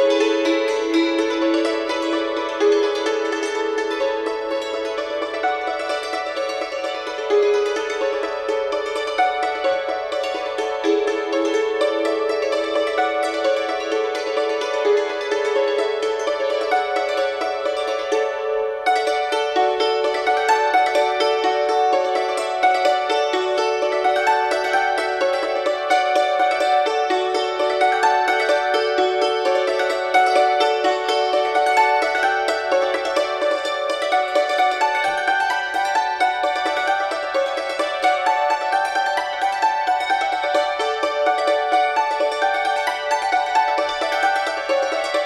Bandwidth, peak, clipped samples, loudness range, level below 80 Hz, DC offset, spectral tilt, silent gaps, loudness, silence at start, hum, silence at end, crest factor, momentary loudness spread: 13 kHz; -6 dBFS; under 0.1%; 4 LU; -60 dBFS; under 0.1%; -1.5 dB/octave; none; -20 LUFS; 0 s; none; 0 s; 14 dB; 5 LU